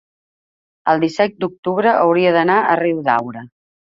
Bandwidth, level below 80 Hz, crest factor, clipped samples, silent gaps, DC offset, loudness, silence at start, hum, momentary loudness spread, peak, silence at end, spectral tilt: 7.6 kHz; -62 dBFS; 16 dB; under 0.1%; 1.58-1.63 s; under 0.1%; -16 LUFS; 0.85 s; none; 10 LU; -2 dBFS; 0.5 s; -6.5 dB/octave